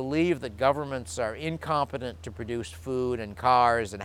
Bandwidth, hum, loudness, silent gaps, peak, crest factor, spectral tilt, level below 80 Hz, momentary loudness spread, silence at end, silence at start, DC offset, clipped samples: 15.5 kHz; none; -28 LUFS; none; -8 dBFS; 18 dB; -5.5 dB/octave; -50 dBFS; 13 LU; 0 s; 0 s; under 0.1%; under 0.1%